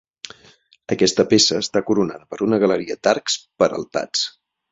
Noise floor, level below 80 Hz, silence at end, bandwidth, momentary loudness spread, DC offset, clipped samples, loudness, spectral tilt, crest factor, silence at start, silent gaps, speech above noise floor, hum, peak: -53 dBFS; -58 dBFS; 0.4 s; 8.4 kHz; 12 LU; under 0.1%; under 0.1%; -19 LUFS; -3.5 dB/octave; 18 dB; 0.25 s; none; 34 dB; none; -2 dBFS